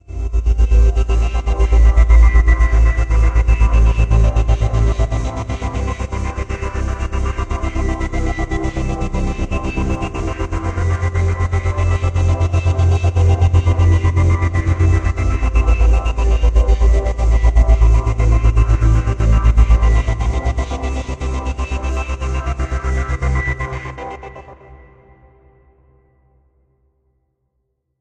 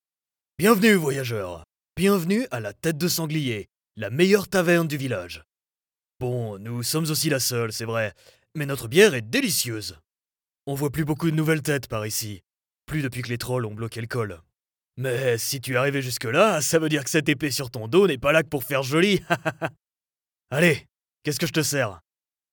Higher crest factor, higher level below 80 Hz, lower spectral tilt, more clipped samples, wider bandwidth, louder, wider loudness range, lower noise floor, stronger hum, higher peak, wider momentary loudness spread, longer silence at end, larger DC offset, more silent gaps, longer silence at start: second, 14 dB vs 20 dB; first, -16 dBFS vs -58 dBFS; first, -7 dB/octave vs -4.5 dB/octave; neither; second, 8.2 kHz vs over 20 kHz; first, -17 LUFS vs -24 LUFS; first, 8 LU vs 5 LU; second, -70 dBFS vs under -90 dBFS; neither; first, 0 dBFS vs -4 dBFS; second, 9 LU vs 14 LU; first, 3.25 s vs 0.55 s; neither; neither; second, 0.1 s vs 0.6 s